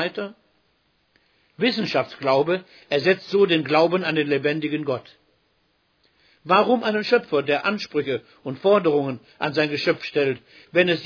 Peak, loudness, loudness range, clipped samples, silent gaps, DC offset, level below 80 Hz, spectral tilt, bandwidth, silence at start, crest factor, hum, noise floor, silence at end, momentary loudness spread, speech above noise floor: -4 dBFS; -22 LUFS; 3 LU; under 0.1%; none; under 0.1%; -70 dBFS; -6.5 dB/octave; 5.4 kHz; 0 s; 20 dB; none; -67 dBFS; 0 s; 10 LU; 45 dB